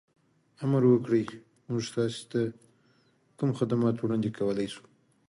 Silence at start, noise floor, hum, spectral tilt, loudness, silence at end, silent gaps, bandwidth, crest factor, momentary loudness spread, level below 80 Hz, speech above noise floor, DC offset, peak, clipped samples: 0.6 s; -66 dBFS; none; -7.5 dB/octave; -29 LUFS; 0.5 s; none; 11.5 kHz; 18 dB; 12 LU; -68 dBFS; 39 dB; under 0.1%; -12 dBFS; under 0.1%